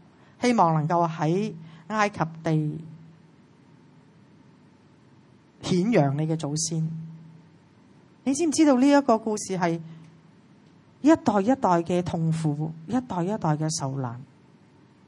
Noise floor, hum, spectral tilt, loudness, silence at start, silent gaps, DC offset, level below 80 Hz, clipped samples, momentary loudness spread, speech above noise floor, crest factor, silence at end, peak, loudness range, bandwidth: -55 dBFS; none; -6 dB/octave; -24 LUFS; 0.4 s; none; under 0.1%; -66 dBFS; under 0.1%; 13 LU; 32 dB; 20 dB; 0.85 s; -6 dBFS; 7 LU; 11.5 kHz